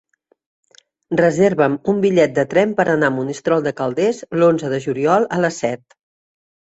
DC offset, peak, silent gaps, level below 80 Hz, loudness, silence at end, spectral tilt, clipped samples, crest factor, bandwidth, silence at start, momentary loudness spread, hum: under 0.1%; -2 dBFS; none; -58 dBFS; -17 LUFS; 1 s; -6.5 dB/octave; under 0.1%; 16 dB; 8.2 kHz; 1.1 s; 7 LU; none